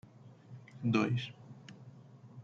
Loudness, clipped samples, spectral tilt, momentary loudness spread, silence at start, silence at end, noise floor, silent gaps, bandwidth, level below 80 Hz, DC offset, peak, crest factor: -34 LUFS; under 0.1%; -7 dB/octave; 25 LU; 0.25 s; 0 s; -56 dBFS; none; 7.6 kHz; -74 dBFS; under 0.1%; -16 dBFS; 22 dB